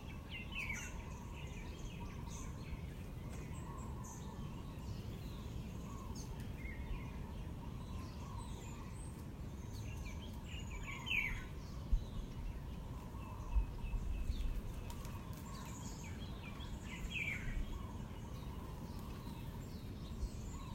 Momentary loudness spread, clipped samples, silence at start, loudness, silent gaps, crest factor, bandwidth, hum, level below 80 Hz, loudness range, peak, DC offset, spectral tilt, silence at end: 7 LU; under 0.1%; 0 s; -46 LUFS; none; 22 dB; 16 kHz; none; -48 dBFS; 5 LU; -24 dBFS; under 0.1%; -5 dB/octave; 0 s